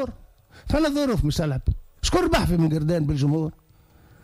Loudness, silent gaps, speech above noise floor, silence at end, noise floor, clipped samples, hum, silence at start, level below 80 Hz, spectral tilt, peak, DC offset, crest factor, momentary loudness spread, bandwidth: -23 LUFS; none; 32 dB; 0.7 s; -54 dBFS; under 0.1%; none; 0 s; -32 dBFS; -6 dB/octave; -8 dBFS; under 0.1%; 16 dB; 7 LU; 15.5 kHz